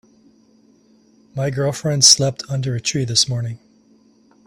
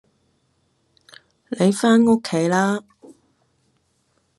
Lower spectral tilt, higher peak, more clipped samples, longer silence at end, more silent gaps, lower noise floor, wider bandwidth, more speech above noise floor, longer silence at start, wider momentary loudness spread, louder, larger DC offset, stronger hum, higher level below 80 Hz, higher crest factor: second, -3 dB/octave vs -5.5 dB/octave; first, 0 dBFS vs -4 dBFS; neither; second, 0.9 s vs 1.6 s; neither; second, -54 dBFS vs -66 dBFS; first, 15.5 kHz vs 12 kHz; second, 36 dB vs 49 dB; second, 1.35 s vs 1.5 s; first, 17 LU vs 10 LU; about the same, -16 LUFS vs -18 LUFS; neither; neither; first, -56 dBFS vs -68 dBFS; about the same, 20 dB vs 18 dB